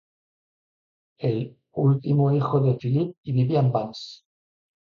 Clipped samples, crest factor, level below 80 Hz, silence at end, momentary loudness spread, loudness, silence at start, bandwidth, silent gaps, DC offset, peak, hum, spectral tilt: under 0.1%; 16 dB; -62 dBFS; 0.8 s; 12 LU; -24 LUFS; 1.2 s; 7 kHz; 3.18-3.24 s; under 0.1%; -8 dBFS; none; -9.5 dB/octave